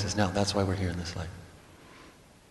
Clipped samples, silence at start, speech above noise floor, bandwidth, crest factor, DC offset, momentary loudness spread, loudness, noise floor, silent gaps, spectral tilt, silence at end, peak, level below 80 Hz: under 0.1%; 0 s; 25 dB; 12 kHz; 22 dB; under 0.1%; 24 LU; -30 LUFS; -54 dBFS; none; -5 dB/octave; 0.4 s; -10 dBFS; -52 dBFS